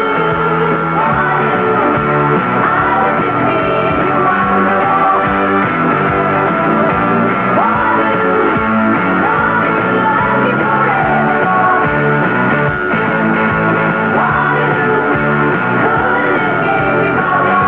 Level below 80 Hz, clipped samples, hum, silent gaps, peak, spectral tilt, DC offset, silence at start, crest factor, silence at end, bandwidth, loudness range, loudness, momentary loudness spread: -40 dBFS; under 0.1%; none; none; 0 dBFS; -9 dB/octave; 0.4%; 0 s; 12 dB; 0 s; 5.4 kHz; 1 LU; -12 LUFS; 1 LU